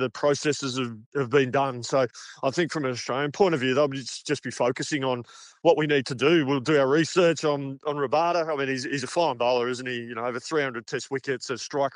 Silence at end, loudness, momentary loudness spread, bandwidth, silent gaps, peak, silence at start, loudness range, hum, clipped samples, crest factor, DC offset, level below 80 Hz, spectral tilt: 0.05 s; -25 LUFS; 9 LU; 10.5 kHz; 1.06-1.12 s; -6 dBFS; 0 s; 3 LU; none; under 0.1%; 18 dB; under 0.1%; -74 dBFS; -4.5 dB/octave